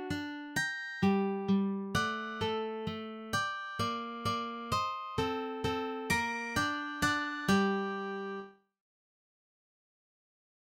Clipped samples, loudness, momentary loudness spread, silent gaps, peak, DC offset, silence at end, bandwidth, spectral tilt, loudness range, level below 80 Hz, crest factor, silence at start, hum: under 0.1%; -34 LUFS; 8 LU; none; -16 dBFS; under 0.1%; 2.2 s; 17 kHz; -4.5 dB/octave; 3 LU; -60 dBFS; 18 dB; 0 s; none